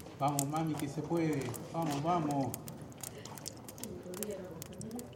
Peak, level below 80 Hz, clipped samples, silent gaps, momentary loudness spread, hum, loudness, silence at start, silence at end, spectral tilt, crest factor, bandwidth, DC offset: -12 dBFS; -66 dBFS; under 0.1%; none; 12 LU; none; -37 LUFS; 0 s; 0 s; -5.5 dB/octave; 24 dB; 17 kHz; under 0.1%